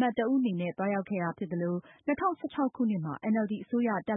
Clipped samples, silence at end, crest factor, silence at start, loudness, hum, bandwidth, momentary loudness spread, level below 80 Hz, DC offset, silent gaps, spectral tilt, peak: under 0.1%; 0 s; 14 dB; 0 s; -31 LUFS; none; 3.9 kHz; 5 LU; -70 dBFS; under 0.1%; none; -11 dB/octave; -16 dBFS